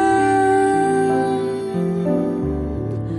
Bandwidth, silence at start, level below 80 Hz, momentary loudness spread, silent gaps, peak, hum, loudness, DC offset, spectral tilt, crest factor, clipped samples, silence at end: 11.5 kHz; 0 s; -38 dBFS; 8 LU; none; -6 dBFS; none; -19 LUFS; under 0.1%; -7 dB/octave; 12 dB; under 0.1%; 0 s